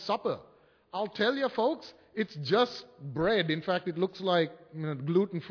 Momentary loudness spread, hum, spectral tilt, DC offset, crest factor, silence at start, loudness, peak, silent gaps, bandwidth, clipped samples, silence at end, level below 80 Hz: 12 LU; none; -6.5 dB/octave; under 0.1%; 18 dB; 0 s; -31 LUFS; -12 dBFS; none; 5.4 kHz; under 0.1%; 0 s; -66 dBFS